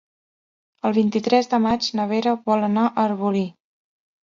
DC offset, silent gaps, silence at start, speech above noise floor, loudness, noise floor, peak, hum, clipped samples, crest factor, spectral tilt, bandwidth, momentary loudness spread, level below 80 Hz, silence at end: under 0.1%; none; 0.85 s; over 70 dB; -21 LUFS; under -90 dBFS; -4 dBFS; none; under 0.1%; 18 dB; -6 dB/octave; 7.4 kHz; 5 LU; -60 dBFS; 0.75 s